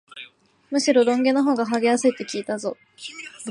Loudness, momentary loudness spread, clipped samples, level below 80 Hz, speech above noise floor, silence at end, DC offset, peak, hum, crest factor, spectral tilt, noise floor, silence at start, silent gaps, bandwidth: -21 LUFS; 19 LU; under 0.1%; -76 dBFS; 25 dB; 0 s; under 0.1%; -6 dBFS; none; 16 dB; -3.5 dB/octave; -47 dBFS; 0.15 s; none; 11 kHz